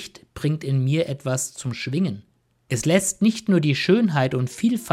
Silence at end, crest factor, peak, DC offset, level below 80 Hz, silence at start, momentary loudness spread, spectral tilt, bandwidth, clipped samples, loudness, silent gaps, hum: 0 s; 16 dB; -6 dBFS; under 0.1%; -56 dBFS; 0 s; 9 LU; -5.5 dB/octave; 15.5 kHz; under 0.1%; -22 LUFS; none; none